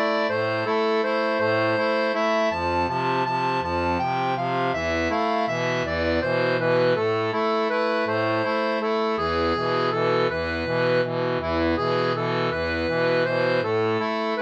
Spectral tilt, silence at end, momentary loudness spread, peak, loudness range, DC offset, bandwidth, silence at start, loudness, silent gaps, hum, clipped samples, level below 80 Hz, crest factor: -6 dB/octave; 0 s; 2 LU; -10 dBFS; 1 LU; under 0.1%; 8.4 kHz; 0 s; -23 LUFS; none; none; under 0.1%; -48 dBFS; 12 dB